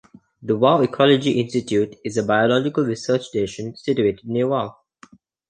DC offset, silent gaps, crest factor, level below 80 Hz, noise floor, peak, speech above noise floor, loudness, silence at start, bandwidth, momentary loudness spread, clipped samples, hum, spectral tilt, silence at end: under 0.1%; none; 18 dB; -58 dBFS; -51 dBFS; -2 dBFS; 31 dB; -20 LUFS; 0.4 s; 9.6 kHz; 9 LU; under 0.1%; none; -6 dB/octave; 0.8 s